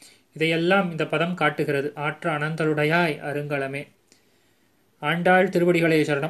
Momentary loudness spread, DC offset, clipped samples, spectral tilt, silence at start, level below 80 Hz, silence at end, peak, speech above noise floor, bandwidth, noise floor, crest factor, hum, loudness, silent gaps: 9 LU; under 0.1%; under 0.1%; -6.5 dB/octave; 0.35 s; -68 dBFS; 0 s; -6 dBFS; 42 dB; 14 kHz; -64 dBFS; 18 dB; none; -23 LUFS; none